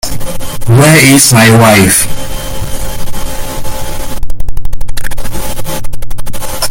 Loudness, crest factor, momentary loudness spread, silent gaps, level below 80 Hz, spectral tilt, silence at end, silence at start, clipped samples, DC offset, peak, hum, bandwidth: -7 LUFS; 6 dB; 19 LU; none; -20 dBFS; -4 dB/octave; 0 s; 0.05 s; 3%; under 0.1%; 0 dBFS; none; over 20 kHz